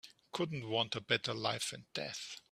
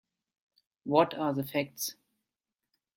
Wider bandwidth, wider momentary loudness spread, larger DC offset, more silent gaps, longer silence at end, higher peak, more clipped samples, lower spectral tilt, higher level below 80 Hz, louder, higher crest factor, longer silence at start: about the same, 15 kHz vs 16.5 kHz; about the same, 9 LU vs 10 LU; neither; neither; second, 0.1 s vs 1.05 s; second, -16 dBFS vs -10 dBFS; neither; about the same, -3.5 dB/octave vs -4.5 dB/octave; about the same, -76 dBFS vs -76 dBFS; second, -37 LUFS vs -30 LUFS; about the same, 24 dB vs 24 dB; second, 0.05 s vs 0.85 s